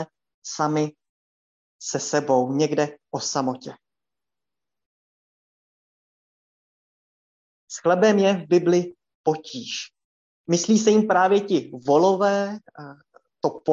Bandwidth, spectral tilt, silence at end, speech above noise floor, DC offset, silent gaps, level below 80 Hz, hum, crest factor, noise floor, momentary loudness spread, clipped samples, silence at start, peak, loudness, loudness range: 8 kHz; -5 dB/octave; 0 s; 69 dB; under 0.1%; 0.34-0.42 s, 1.09-1.79 s, 4.86-7.67 s, 9.15-9.24 s, 10.04-10.44 s; -72 dBFS; none; 18 dB; -90 dBFS; 19 LU; under 0.1%; 0 s; -6 dBFS; -22 LUFS; 9 LU